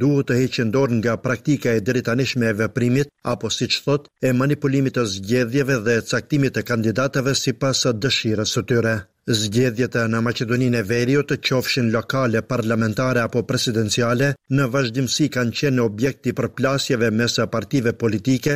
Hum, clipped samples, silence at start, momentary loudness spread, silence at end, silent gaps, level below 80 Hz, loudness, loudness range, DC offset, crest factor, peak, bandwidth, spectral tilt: none; under 0.1%; 0 s; 3 LU; 0 s; none; -52 dBFS; -20 LUFS; 1 LU; 0.1%; 12 dB; -6 dBFS; 16 kHz; -5 dB/octave